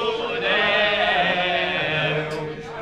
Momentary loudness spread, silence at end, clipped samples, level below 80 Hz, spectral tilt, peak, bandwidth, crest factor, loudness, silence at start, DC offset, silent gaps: 9 LU; 0 s; under 0.1%; -52 dBFS; -4.5 dB/octave; -6 dBFS; 12 kHz; 16 dB; -20 LUFS; 0 s; 0.1%; none